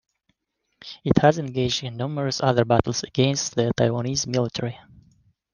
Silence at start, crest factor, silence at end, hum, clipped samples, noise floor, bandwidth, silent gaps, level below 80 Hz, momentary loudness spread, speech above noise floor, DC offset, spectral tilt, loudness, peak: 0.85 s; 22 dB; 0.75 s; none; under 0.1%; -76 dBFS; 10 kHz; none; -50 dBFS; 12 LU; 54 dB; under 0.1%; -5 dB/octave; -23 LUFS; 0 dBFS